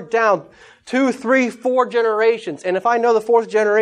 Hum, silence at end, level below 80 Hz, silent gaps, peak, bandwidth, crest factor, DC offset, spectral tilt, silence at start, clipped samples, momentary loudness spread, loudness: none; 0 s; -68 dBFS; none; -2 dBFS; 10.5 kHz; 14 dB; under 0.1%; -4.5 dB/octave; 0 s; under 0.1%; 6 LU; -17 LUFS